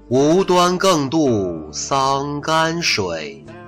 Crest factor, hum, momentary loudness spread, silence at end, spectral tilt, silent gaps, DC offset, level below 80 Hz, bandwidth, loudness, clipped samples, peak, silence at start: 10 dB; none; 11 LU; 0 s; -4.5 dB/octave; none; under 0.1%; -46 dBFS; 16 kHz; -17 LUFS; under 0.1%; -6 dBFS; 0.1 s